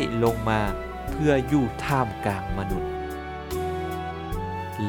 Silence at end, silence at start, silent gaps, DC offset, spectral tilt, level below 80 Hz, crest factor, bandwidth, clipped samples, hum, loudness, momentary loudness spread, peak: 0 s; 0 s; none; under 0.1%; -6.5 dB/octave; -38 dBFS; 18 dB; 19 kHz; under 0.1%; none; -27 LUFS; 10 LU; -8 dBFS